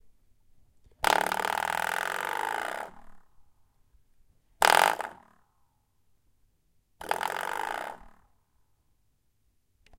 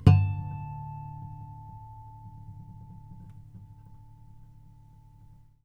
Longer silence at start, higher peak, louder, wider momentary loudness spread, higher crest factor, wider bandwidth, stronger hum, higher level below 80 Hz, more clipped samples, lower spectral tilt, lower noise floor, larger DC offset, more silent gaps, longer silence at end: about the same, 0.05 s vs 0 s; about the same, -2 dBFS vs -4 dBFS; first, -28 LUFS vs -31 LUFS; second, 17 LU vs 22 LU; first, 32 dB vs 26 dB; first, 17 kHz vs 5.4 kHz; neither; second, -62 dBFS vs -50 dBFS; neither; second, -1 dB/octave vs -9 dB/octave; first, -73 dBFS vs -54 dBFS; neither; neither; first, 1.9 s vs 1.6 s